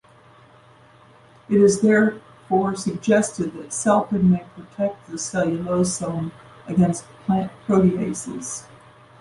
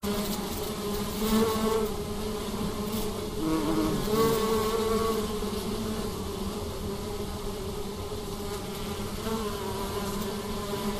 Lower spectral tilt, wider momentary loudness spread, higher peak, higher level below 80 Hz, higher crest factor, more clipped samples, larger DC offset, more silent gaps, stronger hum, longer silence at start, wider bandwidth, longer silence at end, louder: about the same, -6 dB/octave vs -5 dB/octave; first, 13 LU vs 9 LU; first, -6 dBFS vs -14 dBFS; second, -54 dBFS vs -42 dBFS; about the same, 16 dB vs 16 dB; neither; second, under 0.1% vs 0.1%; neither; neither; first, 1.5 s vs 0 s; second, 11.5 kHz vs 16 kHz; first, 0.6 s vs 0 s; first, -21 LUFS vs -30 LUFS